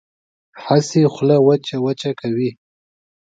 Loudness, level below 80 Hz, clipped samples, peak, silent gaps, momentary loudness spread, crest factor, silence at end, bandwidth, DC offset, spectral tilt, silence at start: -17 LUFS; -62 dBFS; under 0.1%; 0 dBFS; none; 9 LU; 18 dB; 0.7 s; 9 kHz; under 0.1%; -6.5 dB/octave; 0.55 s